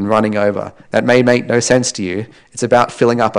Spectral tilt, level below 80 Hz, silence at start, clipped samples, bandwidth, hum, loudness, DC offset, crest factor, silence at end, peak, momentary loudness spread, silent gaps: -4.5 dB/octave; -50 dBFS; 0 s; under 0.1%; 10.5 kHz; none; -14 LUFS; under 0.1%; 14 dB; 0 s; 0 dBFS; 11 LU; none